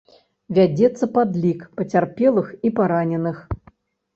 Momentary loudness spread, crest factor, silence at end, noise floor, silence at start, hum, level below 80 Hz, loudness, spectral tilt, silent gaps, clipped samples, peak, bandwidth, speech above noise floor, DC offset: 10 LU; 16 dB; 0.6 s; -54 dBFS; 0.5 s; none; -46 dBFS; -20 LUFS; -8.5 dB/octave; none; under 0.1%; -4 dBFS; 7.8 kHz; 35 dB; under 0.1%